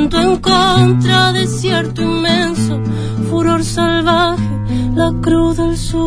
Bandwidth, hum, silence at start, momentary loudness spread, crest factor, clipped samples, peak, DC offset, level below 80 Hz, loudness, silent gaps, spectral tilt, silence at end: 11 kHz; none; 0 s; 7 LU; 12 dB; under 0.1%; 0 dBFS; under 0.1%; -28 dBFS; -13 LUFS; none; -5.5 dB/octave; 0 s